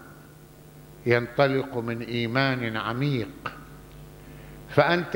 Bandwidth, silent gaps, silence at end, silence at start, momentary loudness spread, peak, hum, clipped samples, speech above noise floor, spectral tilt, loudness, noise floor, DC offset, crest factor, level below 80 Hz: 16.5 kHz; none; 0 s; 0 s; 24 LU; -4 dBFS; none; under 0.1%; 24 dB; -7 dB/octave; -26 LUFS; -49 dBFS; under 0.1%; 24 dB; -54 dBFS